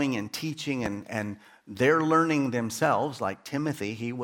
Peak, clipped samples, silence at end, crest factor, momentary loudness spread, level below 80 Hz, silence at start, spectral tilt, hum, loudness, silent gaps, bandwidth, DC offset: -10 dBFS; under 0.1%; 0 s; 18 dB; 11 LU; -64 dBFS; 0 s; -5.5 dB/octave; none; -28 LUFS; none; 17.5 kHz; under 0.1%